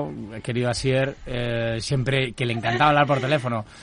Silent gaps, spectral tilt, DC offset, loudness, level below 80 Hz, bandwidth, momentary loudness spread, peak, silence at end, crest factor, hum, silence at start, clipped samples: none; -5.5 dB/octave; under 0.1%; -23 LUFS; -44 dBFS; 11 kHz; 10 LU; -4 dBFS; 0 s; 18 dB; none; 0 s; under 0.1%